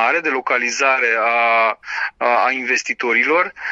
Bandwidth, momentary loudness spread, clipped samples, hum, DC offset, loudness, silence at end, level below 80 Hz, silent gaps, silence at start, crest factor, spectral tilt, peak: 8 kHz; 4 LU; under 0.1%; none; under 0.1%; -16 LUFS; 0 s; -66 dBFS; none; 0 s; 14 dB; -1 dB/octave; -2 dBFS